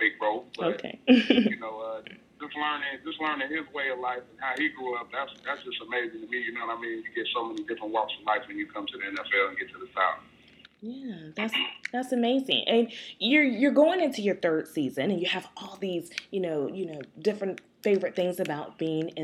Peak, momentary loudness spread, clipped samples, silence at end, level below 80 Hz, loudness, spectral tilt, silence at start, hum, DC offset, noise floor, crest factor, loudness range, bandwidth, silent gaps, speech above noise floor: -6 dBFS; 13 LU; under 0.1%; 0 s; -74 dBFS; -28 LUFS; -5 dB/octave; 0 s; none; under 0.1%; -56 dBFS; 24 dB; 7 LU; 14 kHz; none; 27 dB